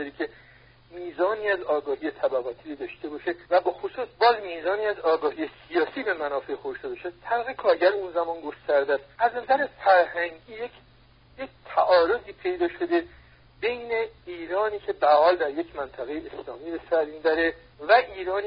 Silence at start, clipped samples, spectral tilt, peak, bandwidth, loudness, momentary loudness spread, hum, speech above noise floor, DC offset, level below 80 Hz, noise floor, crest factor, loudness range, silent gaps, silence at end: 0 s; under 0.1%; -8 dB/octave; -6 dBFS; 5.2 kHz; -25 LUFS; 15 LU; none; 30 dB; under 0.1%; -60 dBFS; -56 dBFS; 20 dB; 3 LU; none; 0 s